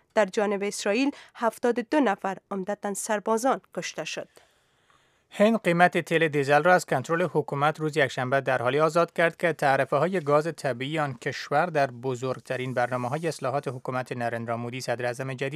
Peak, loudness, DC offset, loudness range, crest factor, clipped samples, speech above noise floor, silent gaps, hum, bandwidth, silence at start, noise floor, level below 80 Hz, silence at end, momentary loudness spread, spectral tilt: -4 dBFS; -26 LUFS; under 0.1%; 6 LU; 22 dB; under 0.1%; 39 dB; none; none; 15.5 kHz; 0.15 s; -64 dBFS; -76 dBFS; 0 s; 10 LU; -5 dB/octave